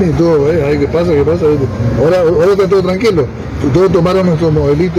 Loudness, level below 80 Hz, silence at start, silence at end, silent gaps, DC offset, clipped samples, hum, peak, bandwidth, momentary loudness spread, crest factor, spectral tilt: -11 LUFS; -28 dBFS; 0 s; 0 s; none; under 0.1%; under 0.1%; none; 0 dBFS; 13.5 kHz; 4 LU; 10 dB; -8 dB/octave